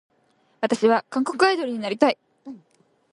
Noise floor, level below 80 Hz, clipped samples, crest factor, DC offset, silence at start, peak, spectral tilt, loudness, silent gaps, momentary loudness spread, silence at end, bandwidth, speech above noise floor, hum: -64 dBFS; -74 dBFS; under 0.1%; 22 dB; under 0.1%; 0.6 s; -2 dBFS; -4 dB/octave; -22 LUFS; none; 22 LU; 0.55 s; 11.5 kHz; 43 dB; none